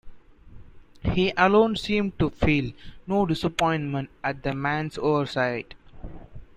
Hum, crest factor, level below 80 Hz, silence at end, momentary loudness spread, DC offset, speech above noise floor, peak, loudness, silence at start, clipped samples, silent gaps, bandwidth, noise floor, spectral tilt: none; 20 dB; -44 dBFS; 0.15 s; 21 LU; under 0.1%; 21 dB; -6 dBFS; -25 LUFS; 0.05 s; under 0.1%; none; 12.5 kHz; -46 dBFS; -6.5 dB/octave